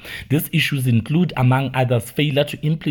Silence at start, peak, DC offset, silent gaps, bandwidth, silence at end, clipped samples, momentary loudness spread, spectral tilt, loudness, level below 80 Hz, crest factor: 0 s; -4 dBFS; under 0.1%; none; 18 kHz; 0 s; under 0.1%; 4 LU; -6.5 dB/octave; -19 LUFS; -48 dBFS; 14 dB